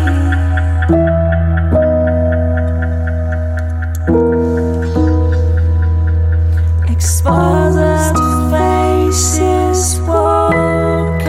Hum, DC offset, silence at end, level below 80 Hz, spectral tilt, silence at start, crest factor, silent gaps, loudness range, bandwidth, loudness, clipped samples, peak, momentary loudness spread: none; under 0.1%; 0 s; -18 dBFS; -6 dB/octave; 0 s; 12 dB; none; 2 LU; 14.5 kHz; -13 LUFS; under 0.1%; 0 dBFS; 5 LU